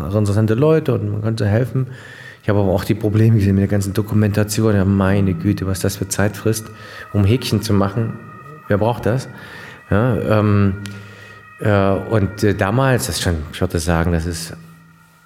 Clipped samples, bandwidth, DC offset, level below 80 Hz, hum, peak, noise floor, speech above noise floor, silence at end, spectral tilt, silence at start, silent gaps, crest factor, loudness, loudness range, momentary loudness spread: under 0.1%; 16 kHz; under 0.1%; -44 dBFS; none; 0 dBFS; -47 dBFS; 30 dB; 0.5 s; -6.5 dB/octave; 0 s; none; 16 dB; -18 LUFS; 3 LU; 18 LU